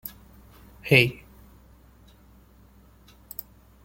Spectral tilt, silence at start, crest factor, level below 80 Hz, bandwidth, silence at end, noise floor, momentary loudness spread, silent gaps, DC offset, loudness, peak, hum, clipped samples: -5.5 dB/octave; 0.05 s; 28 dB; -54 dBFS; 17 kHz; 2.7 s; -54 dBFS; 22 LU; none; under 0.1%; -20 LUFS; -2 dBFS; none; under 0.1%